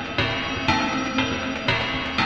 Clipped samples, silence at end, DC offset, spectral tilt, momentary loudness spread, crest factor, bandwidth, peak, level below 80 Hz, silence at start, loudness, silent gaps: under 0.1%; 0 s; under 0.1%; -4.5 dB/octave; 2 LU; 22 dB; 8.8 kHz; -2 dBFS; -42 dBFS; 0 s; -23 LUFS; none